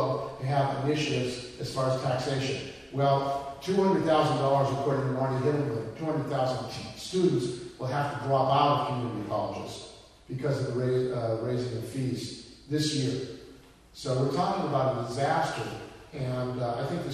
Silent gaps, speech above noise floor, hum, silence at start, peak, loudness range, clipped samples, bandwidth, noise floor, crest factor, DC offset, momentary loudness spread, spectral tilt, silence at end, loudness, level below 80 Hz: none; 24 dB; none; 0 s; -10 dBFS; 4 LU; under 0.1%; 13.5 kHz; -52 dBFS; 18 dB; under 0.1%; 12 LU; -6 dB/octave; 0 s; -29 LUFS; -58 dBFS